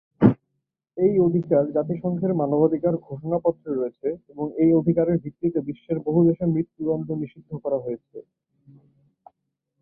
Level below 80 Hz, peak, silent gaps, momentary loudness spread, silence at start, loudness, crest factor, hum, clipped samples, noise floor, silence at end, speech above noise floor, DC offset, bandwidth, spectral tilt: -56 dBFS; -2 dBFS; none; 11 LU; 0.2 s; -23 LUFS; 20 dB; none; under 0.1%; -79 dBFS; 1.6 s; 56 dB; under 0.1%; 3.4 kHz; -13.5 dB/octave